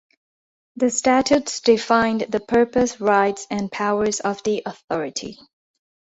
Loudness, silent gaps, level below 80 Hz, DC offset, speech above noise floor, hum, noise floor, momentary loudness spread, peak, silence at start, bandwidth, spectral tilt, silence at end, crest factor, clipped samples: -20 LUFS; 4.84-4.88 s; -56 dBFS; under 0.1%; over 70 dB; none; under -90 dBFS; 10 LU; -4 dBFS; 0.8 s; 8.2 kHz; -3.5 dB/octave; 0.8 s; 18 dB; under 0.1%